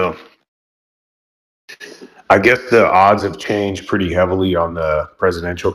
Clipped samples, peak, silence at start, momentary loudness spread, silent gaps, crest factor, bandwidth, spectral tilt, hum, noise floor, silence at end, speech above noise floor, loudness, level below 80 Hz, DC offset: under 0.1%; 0 dBFS; 0 s; 23 LU; 0.48-1.68 s; 16 dB; 15 kHz; -6 dB/octave; none; -38 dBFS; 0 s; 23 dB; -15 LUFS; -42 dBFS; under 0.1%